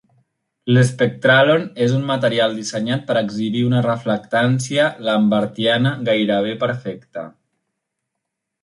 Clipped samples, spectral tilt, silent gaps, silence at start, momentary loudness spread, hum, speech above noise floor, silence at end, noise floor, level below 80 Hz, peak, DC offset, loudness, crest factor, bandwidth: under 0.1%; -6 dB/octave; none; 0.65 s; 10 LU; none; 61 dB; 1.35 s; -79 dBFS; -60 dBFS; -2 dBFS; under 0.1%; -18 LUFS; 16 dB; 11.5 kHz